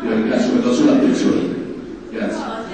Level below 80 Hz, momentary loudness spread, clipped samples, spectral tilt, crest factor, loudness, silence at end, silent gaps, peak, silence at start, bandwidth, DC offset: -50 dBFS; 15 LU; under 0.1%; -5.5 dB/octave; 14 dB; -17 LUFS; 0 s; none; -4 dBFS; 0 s; 9.2 kHz; 0.3%